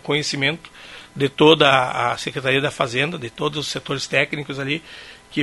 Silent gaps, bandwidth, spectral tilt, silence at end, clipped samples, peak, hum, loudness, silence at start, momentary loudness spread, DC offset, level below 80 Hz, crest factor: none; 11.5 kHz; -4 dB/octave; 0 s; under 0.1%; 0 dBFS; none; -20 LUFS; 0.05 s; 19 LU; under 0.1%; -56 dBFS; 20 dB